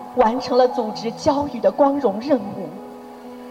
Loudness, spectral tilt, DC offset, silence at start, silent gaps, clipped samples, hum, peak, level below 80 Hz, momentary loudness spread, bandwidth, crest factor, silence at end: -20 LUFS; -6 dB/octave; under 0.1%; 0 s; none; under 0.1%; none; -4 dBFS; -54 dBFS; 20 LU; 15.5 kHz; 18 dB; 0 s